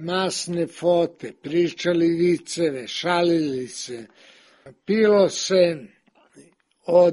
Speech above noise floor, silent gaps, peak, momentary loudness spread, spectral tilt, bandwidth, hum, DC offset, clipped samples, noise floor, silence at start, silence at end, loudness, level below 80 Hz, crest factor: 32 dB; none; -6 dBFS; 16 LU; -5 dB/octave; 11.5 kHz; none; under 0.1%; under 0.1%; -54 dBFS; 0 s; 0 s; -22 LUFS; -66 dBFS; 16 dB